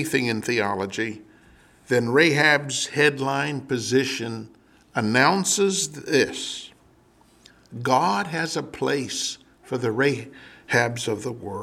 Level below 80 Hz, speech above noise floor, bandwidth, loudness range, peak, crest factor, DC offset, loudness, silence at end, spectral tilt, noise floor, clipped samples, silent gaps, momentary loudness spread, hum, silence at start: -64 dBFS; 34 dB; 16 kHz; 4 LU; -4 dBFS; 22 dB; under 0.1%; -23 LUFS; 0 s; -3.5 dB/octave; -57 dBFS; under 0.1%; none; 13 LU; none; 0 s